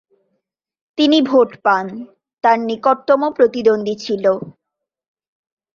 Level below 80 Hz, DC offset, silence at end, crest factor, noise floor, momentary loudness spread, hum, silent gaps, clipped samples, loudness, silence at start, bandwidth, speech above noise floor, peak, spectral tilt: -64 dBFS; under 0.1%; 1.25 s; 16 dB; -81 dBFS; 12 LU; none; 2.33-2.37 s; under 0.1%; -16 LUFS; 1 s; 7.4 kHz; 65 dB; 0 dBFS; -5.5 dB/octave